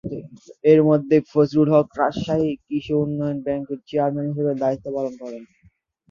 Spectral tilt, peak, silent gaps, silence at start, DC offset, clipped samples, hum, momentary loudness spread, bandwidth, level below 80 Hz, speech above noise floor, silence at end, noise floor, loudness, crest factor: -8.5 dB/octave; -2 dBFS; none; 0.05 s; under 0.1%; under 0.1%; none; 13 LU; 7.2 kHz; -56 dBFS; 38 dB; 0.65 s; -59 dBFS; -21 LUFS; 18 dB